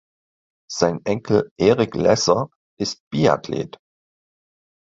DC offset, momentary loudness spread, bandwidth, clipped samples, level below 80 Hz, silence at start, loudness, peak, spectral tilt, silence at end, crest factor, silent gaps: under 0.1%; 11 LU; 7.8 kHz; under 0.1%; -52 dBFS; 0.7 s; -20 LUFS; 0 dBFS; -5 dB/octave; 1.25 s; 20 dB; 1.51-1.56 s, 2.55-2.77 s, 3.00-3.11 s